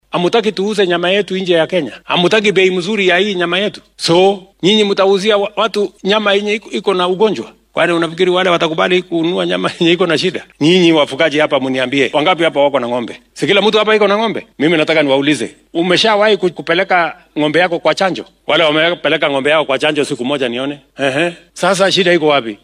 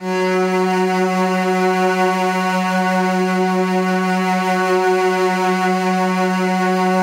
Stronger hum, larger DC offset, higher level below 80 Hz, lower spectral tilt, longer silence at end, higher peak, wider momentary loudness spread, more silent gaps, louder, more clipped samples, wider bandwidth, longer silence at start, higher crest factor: neither; neither; first, -58 dBFS vs -78 dBFS; second, -4.5 dB/octave vs -6 dB/octave; about the same, 0.1 s vs 0 s; first, 0 dBFS vs -6 dBFS; first, 7 LU vs 1 LU; neither; first, -13 LUFS vs -17 LUFS; neither; second, 12 kHz vs 16 kHz; first, 0.15 s vs 0 s; about the same, 12 dB vs 10 dB